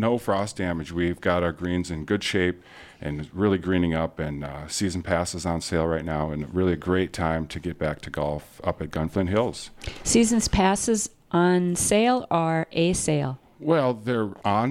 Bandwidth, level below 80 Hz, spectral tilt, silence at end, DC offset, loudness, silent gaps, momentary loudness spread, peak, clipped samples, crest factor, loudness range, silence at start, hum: 15.5 kHz; -42 dBFS; -5 dB/octave; 0 s; under 0.1%; -25 LUFS; none; 10 LU; -6 dBFS; under 0.1%; 18 dB; 5 LU; 0 s; none